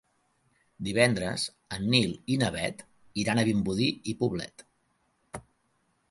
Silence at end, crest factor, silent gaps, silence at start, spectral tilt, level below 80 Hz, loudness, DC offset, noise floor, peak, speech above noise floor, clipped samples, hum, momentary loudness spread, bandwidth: 0.7 s; 24 dB; none; 0.8 s; -5 dB/octave; -56 dBFS; -28 LUFS; under 0.1%; -72 dBFS; -6 dBFS; 45 dB; under 0.1%; none; 20 LU; 11.5 kHz